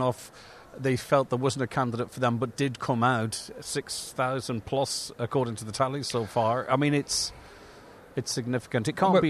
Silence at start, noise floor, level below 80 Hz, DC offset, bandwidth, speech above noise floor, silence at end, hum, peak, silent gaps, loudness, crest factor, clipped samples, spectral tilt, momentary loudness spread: 0 s; -50 dBFS; -60 dBFS; under 0.1%; 14 kHz; 22 dB; 0 s; none; -10 dBFS; none; -28 LUFS; 18 dB; under 0.1%; -5 dB/octave; 10 LU